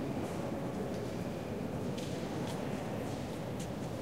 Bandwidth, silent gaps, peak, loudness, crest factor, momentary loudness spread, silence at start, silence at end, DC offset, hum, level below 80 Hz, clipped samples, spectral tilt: 16 kHz; none; -26 dBFS; -39 LUFS; 12 dB; 2 LU; 0 s; 0 s; 0.2%; none; -56 dBFS; under 0.1%; -6.5 dB/octave